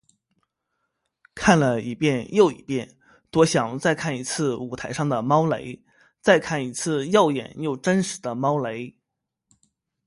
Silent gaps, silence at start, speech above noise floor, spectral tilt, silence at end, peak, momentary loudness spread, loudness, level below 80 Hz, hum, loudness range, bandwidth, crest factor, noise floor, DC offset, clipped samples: none; 1.35 s; 60 dB; -5 dB/octave; 1.15 s; -2 dBFS; 11 LU; -23 LUFS; -56 dBFS; none; 2 LU; 11.5 kHz; 22 dB; -82 dBFS; under 0.1%; under 0.1%